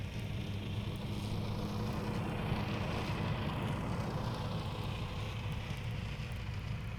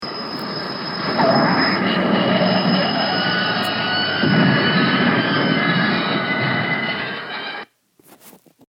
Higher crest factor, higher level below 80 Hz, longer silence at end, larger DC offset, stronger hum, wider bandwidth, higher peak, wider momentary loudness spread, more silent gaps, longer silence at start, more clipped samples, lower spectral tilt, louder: about the same, 14 dB vs 16 dB; first, -48 dBFS vs -62 dBFS; second, 0 s vs 0.4 s; neither; neither; about the same, 17.5 kHz vs 16 kHz; second, -24 dBFS vs -2 dBFS; second, 4 LU vs 10 LU; neither; about the same, 0 s vs 0 s; neither; about the same, -6.5 dB/octave vs -6.5 dB/octave; second, -39 LUFS vs -18 LUFS